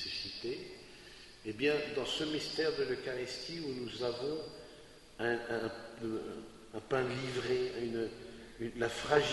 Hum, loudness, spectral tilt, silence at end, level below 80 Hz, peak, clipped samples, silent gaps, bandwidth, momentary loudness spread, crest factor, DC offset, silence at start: none; -37 LUFS; -4.5 dB/octave; 0 s; -64 dBFS; -14 dBFS; under 0.1%; none; 11.5 kHz; 16 LU; 24 dB; under 0.1%; 0 s